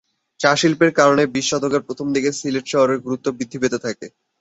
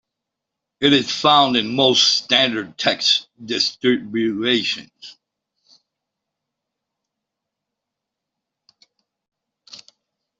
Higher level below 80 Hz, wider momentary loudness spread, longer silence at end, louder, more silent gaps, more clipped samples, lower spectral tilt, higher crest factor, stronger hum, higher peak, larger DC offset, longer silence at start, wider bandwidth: first, -58 dBFS vs -66 dBFS; first, 11 LU vs 8 LU; second, 0.3 s vs 0.6 s; about the same, -19 LUFS vs -17 LUFS; neither; neither; about the same, -4 dB/octave vs -3 dB/octave; about the same, 18 dB vs 20 dB; neither; about the same, -2 dBFS vs -2 dBFS; neither; second, 0.4 s vs 0.8 s; about the same, 8.2 kHz vs 8 kHz